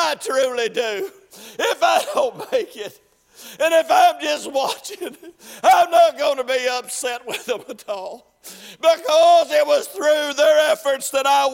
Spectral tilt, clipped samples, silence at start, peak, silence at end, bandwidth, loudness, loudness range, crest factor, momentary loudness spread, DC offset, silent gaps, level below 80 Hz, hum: -1 dB/octave; under 0.1%; 0 s; -4 dBFS; 0 s; 16.5 kHz; -18 LUFS; 4 LU; 16 dB; 18 LU; under 0.1%; none; -68 dBFS; none